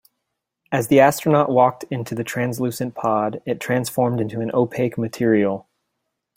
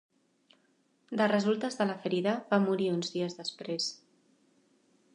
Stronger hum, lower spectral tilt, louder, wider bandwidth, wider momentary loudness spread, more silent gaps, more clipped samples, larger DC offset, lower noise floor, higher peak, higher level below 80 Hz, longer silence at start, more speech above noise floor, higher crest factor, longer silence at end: neither; about the same, -6 dB/octave vs -5 dB/octave; first, -20 LUFS vs -31 LUFS; first, 16.5 kHz vs 10.5 kHz; first, 11 LU vs 8 LU; neither; neither; neither; first, -79 dBFS vs -71 dBFS; first, 0 dBFS vs -14 dBFS; first, -60 dBFS vs -80 dBFS; second, 0.7 s vs 1.1 s; first, 59 dB vs 41 dB; about the same, 20 dB vs 20 dB; second, 0.75 s vs 1.2 s